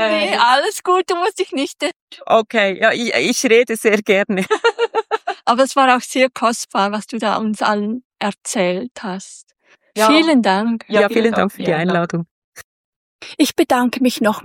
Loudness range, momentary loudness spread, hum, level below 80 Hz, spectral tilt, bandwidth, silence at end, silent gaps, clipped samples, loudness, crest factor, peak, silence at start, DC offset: 3 LU; 11 LU; none; -66 dBFS; -4 dB/octave; 17 kHz; 0 s; 1.96-2.08 s, 8.05-8.10 s, 8.91-8.95 s, 12.31-12.53 s, 12.64-13.19 s; under 0.1%; -16 LUFS; 16 dB; 0 dBFS; 0 s; under 0.1%